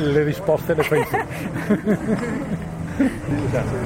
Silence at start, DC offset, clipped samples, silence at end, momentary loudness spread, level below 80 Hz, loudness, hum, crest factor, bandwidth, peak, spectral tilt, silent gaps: 0 s; under 0.1%; under 0.1%; 0 s; 8 LU; -40 dBFS; -22 LUFS; none; 14 dB; 16.5 kHz; -6 dBFS; -7 dB/octave; none